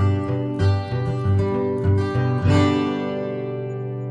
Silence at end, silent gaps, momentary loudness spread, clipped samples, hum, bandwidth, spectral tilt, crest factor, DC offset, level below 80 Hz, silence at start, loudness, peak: 0 s; none; 10 LU; under 0.1%; none; 8 kHz; -8 dB/octave; 14 dB; under 0.1%; -48 dBFS; 0 s; -22 LUFS; -6 dBFS